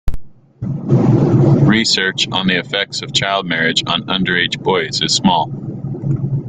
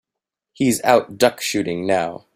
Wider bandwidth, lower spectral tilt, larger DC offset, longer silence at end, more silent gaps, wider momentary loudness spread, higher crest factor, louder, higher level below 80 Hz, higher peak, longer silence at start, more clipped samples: second, 9.4 kHz vs 16 kHz; about the same, -4.5 dB/octave vs -4 dB/octave; neither; second, 0 s vs 0.2 s; neither; first, 12 LU vs 7 LU; about the same, 14 dB vs 18 dB; first, -15 LUFS vs -19 LUFS; first, -34 dBFS vs -58 dBFS; about the same, 0 dBFS vs -2 dBFS; second, 0.05 s vs 0.6 s; neither